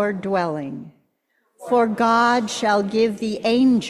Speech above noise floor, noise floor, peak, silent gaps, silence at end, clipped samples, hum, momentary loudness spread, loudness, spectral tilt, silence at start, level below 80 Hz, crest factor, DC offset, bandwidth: 49 dB; -69 dBFS; -4 dBFS; none; 0 s; under 0.1%; none; 13 LU; -20 LUFS; -5 dB/octave; 0 s; -62 dBFS; 16 dB; under 0.1%; 12.5 kHz